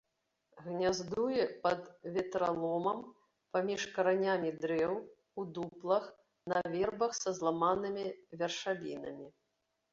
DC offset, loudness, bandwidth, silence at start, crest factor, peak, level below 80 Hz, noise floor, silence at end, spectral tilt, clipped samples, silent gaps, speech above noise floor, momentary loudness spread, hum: under 0.1%; -35 LUFS; 7.8 kHz; 0.55 s; 18 dB; -18 dBFS; -72 dBFS; -83 dBFS; 0.6 s; -4 dB/octave; under 0.1%; none; 48 dB; 12 LU; none